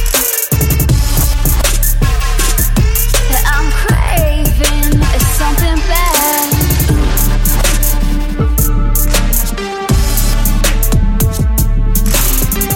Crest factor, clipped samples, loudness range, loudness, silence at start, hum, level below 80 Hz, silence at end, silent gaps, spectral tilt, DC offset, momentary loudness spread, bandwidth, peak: 10 dB; under 0.1%; 2 LU; -13 LUFS; 0 s; none; -12 dBFS; 0 s; none; -4 dB/octave; under 0.1%; 3 LU; 17 kHz; 0 dBFS